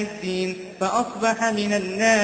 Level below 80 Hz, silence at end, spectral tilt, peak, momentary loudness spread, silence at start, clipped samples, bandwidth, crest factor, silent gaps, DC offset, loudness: -60 dBFS; 0 s; -4 dB/octave; -6 dBFS; 7 LU; 0 s; under 0.1%; 9.2 kHz; 16 dB; none; under 0.1%; -23 LUFS